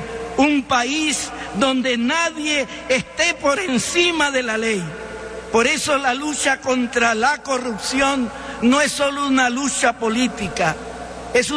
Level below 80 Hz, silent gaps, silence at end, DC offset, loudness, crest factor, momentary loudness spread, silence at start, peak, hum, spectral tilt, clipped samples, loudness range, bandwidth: -46 dBFS; none; 0 s; under 0.1%; -19 LUFS; 16 dB; 7 LU; 0 s; -4 dBFS; none; -2.5 dB/octave; under 0.1%; 1 LU; 11 kHz